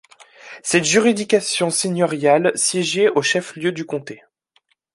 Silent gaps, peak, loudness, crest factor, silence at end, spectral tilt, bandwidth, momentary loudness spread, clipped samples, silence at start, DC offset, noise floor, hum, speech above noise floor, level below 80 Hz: none; -2 dBFS; -18 LUFS; 18 dB; 0.8 s; -3.5 dB/octave; 11.5 kHz; 12 LU; under 0.1%; 0.45 s; under 0.1%; -64 dBFS; none; 45 dB; -64 dBFS